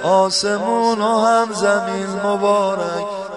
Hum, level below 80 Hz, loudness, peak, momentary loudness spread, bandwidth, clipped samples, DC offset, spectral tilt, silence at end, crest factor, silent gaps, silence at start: none; -64 dBFS; -17 LUFS; -2 dBFS; 7 LU; 11 kHz; under 0.1%; 0.1%; -4 dB/octave; 0 s; 14 dB; none; 0 s